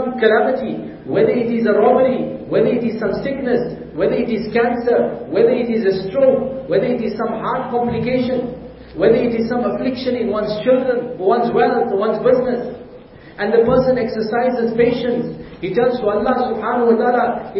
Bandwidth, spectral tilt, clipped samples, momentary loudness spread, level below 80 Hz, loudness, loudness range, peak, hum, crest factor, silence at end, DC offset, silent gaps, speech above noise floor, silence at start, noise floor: 5.8 kHz; -11 dB/octave; under 0.1%; 7 LU; -46 dBFS; -17 LUFS; 2 LU; -2 dBFS; none; 16 dB; 0 s; under 0.1%; none; 23 dB; 0 s; -39 dBFS